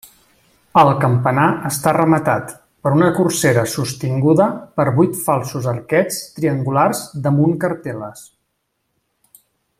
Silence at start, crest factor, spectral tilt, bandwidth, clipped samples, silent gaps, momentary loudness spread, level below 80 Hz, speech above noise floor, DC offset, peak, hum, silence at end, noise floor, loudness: 0.75 s; 16 dB; -6 dB/octave; 16 kHz; under 0.1%; none; 9 LU; -54 dBFS; 55 dB; under 0.1%; 0 dBFS; none; 1.55 s; -71 dBFS; -17 LUFS